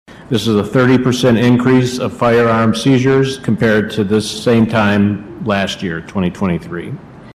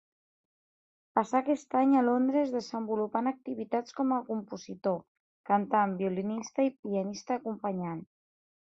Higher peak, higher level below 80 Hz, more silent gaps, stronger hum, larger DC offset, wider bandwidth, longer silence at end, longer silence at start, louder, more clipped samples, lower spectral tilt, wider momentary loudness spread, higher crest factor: first, -2 dBFS vs -10 dBFS; first, -44 dBFS vs -76 dBFS; second, none vs 5.08-5.44 s, 6.79-6.83 s; neither; neither; first, 14 kHz vs 7.8 kHz; second, 0.05 s vs 0.6 s; second, 0.1 s vs 1.15 s; first, -14 LUFS vs -31 LUFS; neither; about the same, -6 dB/octave vs -6.5 dB/octave; about the same, 10 LU vs 11 LU; second, 12 dB vs 22 dB